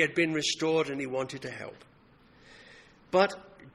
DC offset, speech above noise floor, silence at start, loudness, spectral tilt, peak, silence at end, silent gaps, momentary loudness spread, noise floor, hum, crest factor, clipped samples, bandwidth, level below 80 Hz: under 0.1%; 30 dB; 0 s; -29 LUFS; -4 dB/octave; -10 dBFS; 0.05 s; none; 15 LU; -59 dBFS; none; 22 dB; under 0.1%; 12 kHz; -68 dBFS